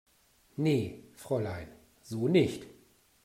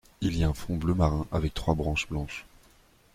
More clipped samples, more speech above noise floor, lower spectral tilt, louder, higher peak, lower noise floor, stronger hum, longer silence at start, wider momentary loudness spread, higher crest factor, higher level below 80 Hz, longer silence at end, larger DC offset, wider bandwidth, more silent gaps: neither; first, 36 dB vs 32 dB; about the same, -7 dB/octave vs -6.5 dB/octave; about the same, -31 LUFS vs -29 LUFS; about the same, -12 dBFS vs -12 dBFS; first, -66 dBFS vs -60 dBFS; neither; first, 0.6 s vs 0.2 s; first, 19 LU vs 8 LU; about the same, 22 dB vs 18 dB; second, -64 dBFS vs -38 dBFS; second, 0.55 s vs 0.75 s; neither; about the same, 16 kHz vs 15.5 kHz; neither